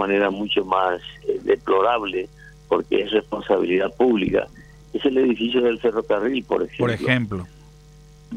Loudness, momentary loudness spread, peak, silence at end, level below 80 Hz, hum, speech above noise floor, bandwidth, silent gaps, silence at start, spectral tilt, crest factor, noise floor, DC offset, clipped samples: -21 LUFS; 9 LU; -4 dBFS; 0 s; -50 dBFS; none; 26 dB; 9.8 kHz; none; 0 s; -7 dB/octave; 16 dB; -47 dBFS; under 0.1%; under 0.1%